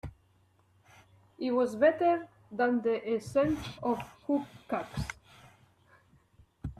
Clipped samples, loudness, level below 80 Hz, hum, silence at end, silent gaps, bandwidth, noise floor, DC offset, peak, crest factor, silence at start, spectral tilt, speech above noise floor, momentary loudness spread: under 0.1%; -31 LUFS; -56 dBFS; none; 0.05 s; none; 14 kHz; -67 dBFS; under 0.1%; -12 dBFS; 20 dB; 0.05 s; -6.5 dB/octave; 37 dB; 15 LU